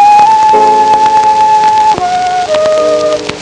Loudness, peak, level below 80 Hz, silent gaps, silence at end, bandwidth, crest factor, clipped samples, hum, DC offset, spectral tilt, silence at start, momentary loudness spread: -7 LUFS; 0 dBFS; -44 dBFS; none; 0 s; 10 kHz; 6 dB; under 0.1%; none; under 0.1%; -3 dB/octave; 0 s; 6 LU